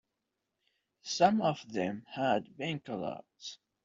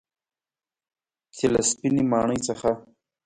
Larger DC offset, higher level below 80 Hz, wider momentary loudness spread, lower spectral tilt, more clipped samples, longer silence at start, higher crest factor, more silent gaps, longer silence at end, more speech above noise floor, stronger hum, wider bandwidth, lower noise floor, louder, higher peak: neither; second, -74 dBFS vs -56 dBFS; first, 19 LU vs 5 LU; about the same, -4 dB/octave vs -4.5 dB/octave; neither; second, 1.05 s vs 1.35 s; first, 24 dB vs 18 dB; neither; second, 0.3 s vs 0.45 s; second, 53 dB vs over 67 dB; neither; second, 7.8 kHz vs 11 kHz; second, -86 dBFS vs under -90 dBFS; second, -33 LUFS vs -24 LUFS; second, -12 dBFS vs -8 dBFS